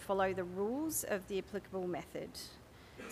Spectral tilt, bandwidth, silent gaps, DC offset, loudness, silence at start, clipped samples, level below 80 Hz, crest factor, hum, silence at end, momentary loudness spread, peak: -4 dB/octave; 15.5 kHz; none; under 0.1%; -39 LUFS; 0 s; under 0.1%; -64 dBFS; 18 dB; none; 0 s; 16 LU; -22 dBFS